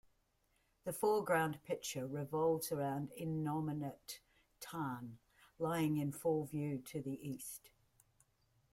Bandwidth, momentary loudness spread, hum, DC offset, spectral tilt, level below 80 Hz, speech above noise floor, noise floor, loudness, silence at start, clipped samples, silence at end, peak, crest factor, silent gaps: 16.5 kHz; 13 LU; none; under 0.1%; -5.5 dB/octave; -74 dBFS; 39 dB; -78 dBFS; -40 LUFS; 0.85 s; under 0.1%; 1.05 s; -22 dBFS; 20 dB; none